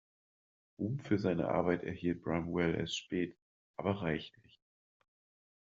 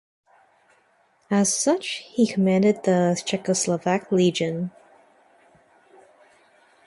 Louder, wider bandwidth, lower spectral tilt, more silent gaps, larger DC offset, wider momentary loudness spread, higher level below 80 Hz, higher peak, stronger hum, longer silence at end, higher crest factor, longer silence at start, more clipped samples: second, -36 LUFS vs -22 LUFS; second, 7.4 kHz vs 11.5 kHz; about the same, -5.5 dB/octave vs -4.5 dB/octave; first, 3.42-3.74 s vs none; neither; about the same, 8 LU vs 7 LU; about the same, -66 dBFS vs -68 dBFS; second, -16 dBFS vs -8 dBFS; neither; second, 1.45 s vs 2.15 s; first, 22 dB vs 16 dB; second, 0.8 s vs 1.3 s; neither